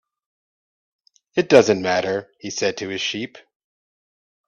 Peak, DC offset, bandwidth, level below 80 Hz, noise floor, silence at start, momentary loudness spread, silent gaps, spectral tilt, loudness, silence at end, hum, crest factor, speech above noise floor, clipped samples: 0 dBFS; under 0.1%; 8.6 kHz; -64 dBFS; under -90 dBFS; 1.35 s; 15 LU; none; -4 dB/octave; -20 LUFS; 1.1 s; none; 22 dB; over 70 dB; under 0.1%